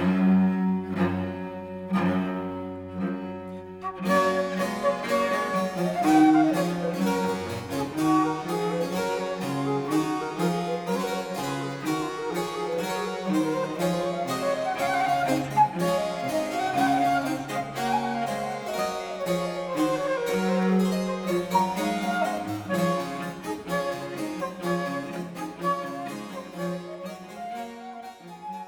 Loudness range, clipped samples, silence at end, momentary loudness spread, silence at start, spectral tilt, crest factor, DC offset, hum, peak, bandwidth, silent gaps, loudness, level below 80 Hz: 7 LU; under 0.1%; 0 s; 12 LU; 0 s; -6 dB/octave; 18 dB; under 0.1%; none; -8 dBFS; 19.5 kHz; none; -27 LUFS; -60 dBFS